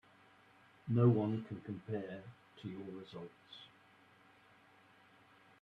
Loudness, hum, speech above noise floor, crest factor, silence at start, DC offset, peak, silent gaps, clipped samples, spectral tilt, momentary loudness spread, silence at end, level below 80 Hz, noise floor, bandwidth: -38 LUFS; none; 29 dB; 22 dB; 0.85 s; under 0.1%; -18 dBFS; none; under 0.1%; -10 dB/octave; 24 LU; 1.95 s; -78 dBFS; -66 dBFS; 4.8 kHz